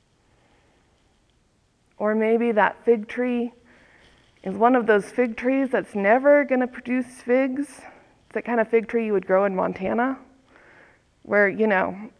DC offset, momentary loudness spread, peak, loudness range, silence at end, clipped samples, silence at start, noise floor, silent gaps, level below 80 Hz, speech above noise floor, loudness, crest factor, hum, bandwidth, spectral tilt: under 0.1%; 9 LU; -4 dBFS; 4 LU; 0.1 s; under 0.1%; 2 s; -64 dBFS; none; -64 dBFS; 43 dB; -22 LUFS; 20 dB; none; 11 kHz; -7 dB/octave